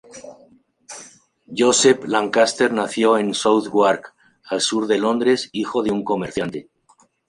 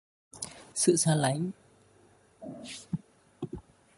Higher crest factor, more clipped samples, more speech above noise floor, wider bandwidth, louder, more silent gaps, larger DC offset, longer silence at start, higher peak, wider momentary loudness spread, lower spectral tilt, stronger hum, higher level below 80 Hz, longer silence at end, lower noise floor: second, 18 dB vs 24 dB; neither; first, 39 dB vs 34 dB; about the same, 11.5 kHz vs 12 kHz; first, -19 LUFS vs -30 LUFS; neither; neither; second, 0.15 s vs 0.35 s; first, -2 dBFS vs -10 dBFS; about the same, 20 LU vs 22 LU; second, -3 dB/octave vs -4.5 dB/octave; neither; about the same, -60 dBFS vs -64 dBFS; first, 0.65 s vs 0.4 s; second, -58 dBFS vs -62 dBFS